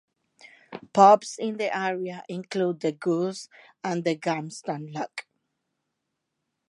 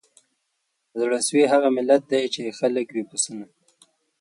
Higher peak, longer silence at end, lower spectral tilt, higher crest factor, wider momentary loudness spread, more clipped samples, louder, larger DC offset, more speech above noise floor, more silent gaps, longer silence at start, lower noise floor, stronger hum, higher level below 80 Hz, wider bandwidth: about the same, -4 dBFS vs -4 dBFS; first, 1.45 s vs 0.75 s; first, -5.5 dB/octave vs -3 dB/octave; about the same, 22 dB vs 20 dB; first, 20 LU vs 10 LU; neither; second, -25 LUFS vs -22 LUFS; neither; about the same, 56 dB vs 54 dB; neither; second, 0.7 s vs 0.95 s; first, -81 dBFS vs -75 dBFS; neither; about the same, -80 dBFS vs -76 dBFS; about the same, 11.5 kHz vs 11.5 kHz